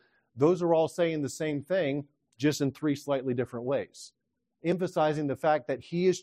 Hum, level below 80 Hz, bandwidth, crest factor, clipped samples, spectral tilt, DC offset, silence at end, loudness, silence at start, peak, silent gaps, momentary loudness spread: none; -72 dBFS; 15 kHz; 18 dB; under 0.1%; -6 dB/octave; under 0.1%; 0 s; -29 LUFS; 0.35 s; -12 dBFS; none; 8 LU